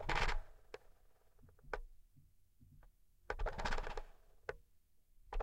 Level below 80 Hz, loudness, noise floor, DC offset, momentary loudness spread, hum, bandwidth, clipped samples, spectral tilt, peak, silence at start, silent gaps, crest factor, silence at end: -48 dBFS; -45 LUFS; -71 dBFS; under 0.1%; 19 LU; none; 9.8 kHz; under 0.1%; -4 dB/octave; -22 dBFS; 0 s; none; 22 dB; 0 s